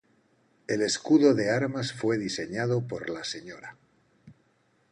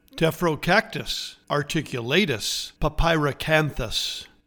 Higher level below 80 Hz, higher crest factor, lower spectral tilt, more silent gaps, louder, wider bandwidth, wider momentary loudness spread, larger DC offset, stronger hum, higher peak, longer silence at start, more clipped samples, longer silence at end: second, -66 dBFS vs -36 dBFS; about the same, 20 dB vs 20 dB; about the same, -5 dB/octave vs -4 dB/octave; neither; second, -27 LUFS vs -24 LUFS; second, 10.5 kHz vs 19 kHz; first, 21 LU vs 7 LU; neither; neither; second, -8 dBFS vs -4 dBFS; first, 0.7 s vs 0.15 s; neither; first, 0.6 s vs 0.2 s